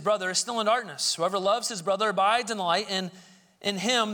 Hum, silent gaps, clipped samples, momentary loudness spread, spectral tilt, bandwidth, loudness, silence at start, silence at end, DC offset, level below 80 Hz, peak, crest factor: none; none; under 0.1%; 7 LU; -2 dB/octave; 19 kHz; -26 LUFS; 0 s; 0 s; under 0.1%; -74 dBFS; -10 dBFS; 16 dB